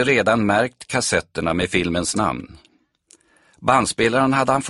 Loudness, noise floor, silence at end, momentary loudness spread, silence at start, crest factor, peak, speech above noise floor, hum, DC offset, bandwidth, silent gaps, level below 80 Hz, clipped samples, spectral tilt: -19 LUFS; -56 dBFS; 0 s; 6 LU; 0 s; 18 dB; -2 dBFS; 37 dB; none; under 0.1%; 11.5 kHz; none; -48 dBFS; under 0.1%; -4 dB/octave